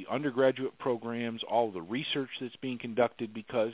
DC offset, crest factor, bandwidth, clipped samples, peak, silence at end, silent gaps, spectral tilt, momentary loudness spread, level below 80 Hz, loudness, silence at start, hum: under 0.1%; 20 dB; 4 kHz; under 0.1%; -12 dBFS; 0 s; none; -3.5 dB/octave; 10 LU; -74 dBFS; -32 LUFS; 0 s; none